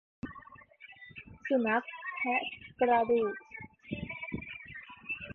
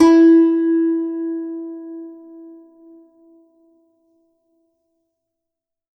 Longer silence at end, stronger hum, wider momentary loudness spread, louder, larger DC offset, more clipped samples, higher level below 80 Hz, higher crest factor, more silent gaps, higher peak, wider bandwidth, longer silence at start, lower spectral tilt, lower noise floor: second, 0 s vs 3.5 s; neither; second, 20 LU vs 27 LU; second, -33 LUFS vs -15 LUFS; neither; neither; about the same, -62 dBFS vs -62 dBFS; about the same, 20 dB vs 18 dB; neither; second, -14 dBFS vs -2 dBFS; second, 4.3 kHz vs 6.2 kHz; first, 0.25 s vs 0 s; first, -7.5 dB/octave vs -5 dB/octave; second, -54 dBFS vs -83 dBFS